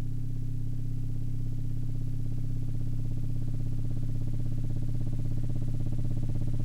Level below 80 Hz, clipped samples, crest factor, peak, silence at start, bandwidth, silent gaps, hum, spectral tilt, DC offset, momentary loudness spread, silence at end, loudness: -32 dBFS; under 0.1%; 8 dB; -20 dBFS; 0 s; 1.3 kHz; none; 50 Hz at -60 dBFS; -9 dB/octave; under 0.1%; 2 LU; 0 s; -34 LUFS